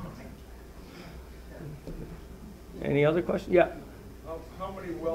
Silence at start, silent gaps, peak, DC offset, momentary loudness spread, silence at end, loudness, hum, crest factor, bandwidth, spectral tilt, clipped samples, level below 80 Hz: 0 s; none; -10 dBFS; under 0.1%; 22 LU; 0 s; -29 LUFS; none; 22 dB; 16 kHz; -7.5 dB/octave; under 0.1%; -48 dBFS